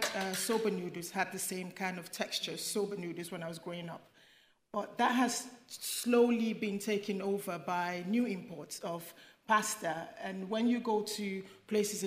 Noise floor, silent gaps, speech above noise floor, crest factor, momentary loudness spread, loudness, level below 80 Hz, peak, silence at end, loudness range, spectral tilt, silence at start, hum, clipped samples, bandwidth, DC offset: -66 dBFS; none; 31 dB; 20 dB; 12 LU; -35 LUFS; -84 dBFS; -16 dBFS; 0 s; 5 LU; -3.5 dB/octave; 0 s; none; under 0.1%; 16 kHz; under 0.1%